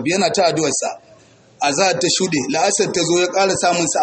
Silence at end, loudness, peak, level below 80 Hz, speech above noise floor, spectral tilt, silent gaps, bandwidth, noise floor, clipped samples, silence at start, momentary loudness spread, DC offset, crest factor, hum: 0 s; -17 LUFS; -4 dBFS; -58 dBFS; 31 dB; -3 dB/octave; none; 8.8 kHz; -48 dBFS; under 0.1%; 0 s; 6 LU; under 0.1%; 14 dB; none